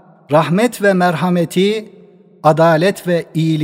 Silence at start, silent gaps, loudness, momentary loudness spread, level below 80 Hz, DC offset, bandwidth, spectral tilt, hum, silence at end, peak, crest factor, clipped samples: 0.3 s; none; -14 LUFS; 6 LU; -64 dBFS; under 0.1%; 16 kHz; -6.5 dB/octave; none; 0 s; 0 dBFS; 14 dB; under 0.1%